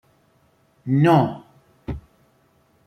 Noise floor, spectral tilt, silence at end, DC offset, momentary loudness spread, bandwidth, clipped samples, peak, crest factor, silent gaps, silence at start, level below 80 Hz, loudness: -61 dBFS; -8.5 dB/octave; 0.9 s; under 0.1%; 22 LU; 13 kHz; under 0.1%; -4 dBFS; 20 dB; none; 0.85 s; -48 dBFS; -19 LUFS